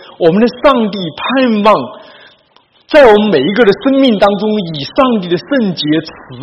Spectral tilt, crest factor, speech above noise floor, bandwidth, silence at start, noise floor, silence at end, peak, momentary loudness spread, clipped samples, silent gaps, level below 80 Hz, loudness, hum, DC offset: -7 dB/octave; 10 dB; 40 dB; 8.8 kHz; 0.2 s; -50 dBFS; 0 s; 0 dBFS; 10 LU; 0.8%; none; -44 dBFS; -11 LUFS; none; under 0.1%